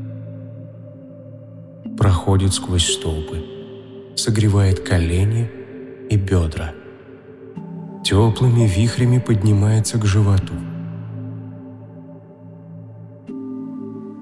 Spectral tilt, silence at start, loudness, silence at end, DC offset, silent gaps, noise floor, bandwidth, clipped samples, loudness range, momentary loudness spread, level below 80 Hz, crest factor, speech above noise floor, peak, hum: -5.5 dB/octave; 0 s; -18 LUFS; 0 s; under 0.1%; none; -40 dBFS; 12 kHz; under 0.1%; 8 LU; 23 LU; -40 dBFS; 16 dB; 24 dB; -4 dBFS; none